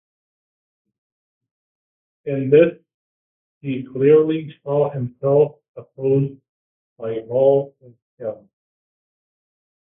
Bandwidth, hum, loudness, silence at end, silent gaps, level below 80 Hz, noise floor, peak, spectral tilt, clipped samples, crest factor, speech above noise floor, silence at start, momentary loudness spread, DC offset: 3.7 kHz; none; -19 LUFS; 1.65 s; 2.94-3.61 s, 5.68-5.75 s, 6.49-6.96 s, 8.02-8.17 s; -66 dBFS; under -90 dBFS; -2 dBFS; -12.5 dB/octave; under 0.1%; 20 dB; over 72 dB; 2.25 s; 17 LU; under 0.1%